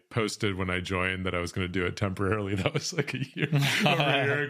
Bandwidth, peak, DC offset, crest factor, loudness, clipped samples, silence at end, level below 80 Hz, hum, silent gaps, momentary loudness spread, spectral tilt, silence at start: 15.5 kHz; -6 dBFS; under 0.1%; 22 dB; -28 LUFS; under 0.1%; 0 s; -56 dBFS; none; none; 7 LU; -5 dB/octave; 0.1 s